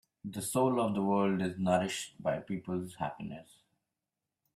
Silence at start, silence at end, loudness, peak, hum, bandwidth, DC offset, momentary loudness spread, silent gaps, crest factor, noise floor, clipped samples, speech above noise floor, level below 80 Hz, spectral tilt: 0.25 s; 1.15 s; -33 LUFS; -14 dBFS; none; 15 kHz; under 0.1%; 13 LU; none; 20 dB; -89 dBFS; under 0.1%; 57 dB; -70 dBFS; -5.5 dB/octave